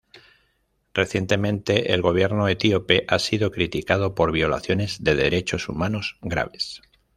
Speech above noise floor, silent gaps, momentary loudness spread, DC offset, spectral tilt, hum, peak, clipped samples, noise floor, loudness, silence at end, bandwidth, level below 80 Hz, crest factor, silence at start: 47 dB; none; 7 LU; under 0.1%; -5.5 dB/octave; none; -2 dBFS; under 0.1%; -69 dBFS; -22 LUFS; 0.4 s; 14 kHz; -46 dBFS; 20 dB; 0.15 s